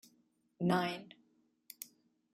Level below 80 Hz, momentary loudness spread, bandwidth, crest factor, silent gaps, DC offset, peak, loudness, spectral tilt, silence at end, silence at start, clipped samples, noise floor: -78 dBFS; 22 LU; 16 kHz; 22 dB; none; under 0.1%; -18 dBFS; -36 LUFS; -5.5 dB/octave; 0.5 s; 0.6 s; under 0.1%; -74 dBFS